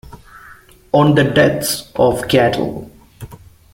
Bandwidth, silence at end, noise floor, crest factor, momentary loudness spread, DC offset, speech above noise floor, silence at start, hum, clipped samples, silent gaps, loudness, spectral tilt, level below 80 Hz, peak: 16.5 kHz; 0.4 s; -43 dBFS; 16 dB; 18 LU; under 0.1%; 29 dB; 0.1 s; none; under 0.1%; none; -15 LUFS; -5.5 dB/octave; -42 dBFS; -2 dBFS